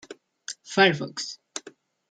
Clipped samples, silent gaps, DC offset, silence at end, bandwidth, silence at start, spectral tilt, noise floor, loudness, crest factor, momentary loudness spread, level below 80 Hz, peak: under 0.1%; none; under 0.1%; 0.4 s; 9.4 kHz; 0.1 s; -3.5 dB/octave; -51 dBFS; -24 LUFS; 22 dB; 19 LU; -74 dBFS; -6 dBFS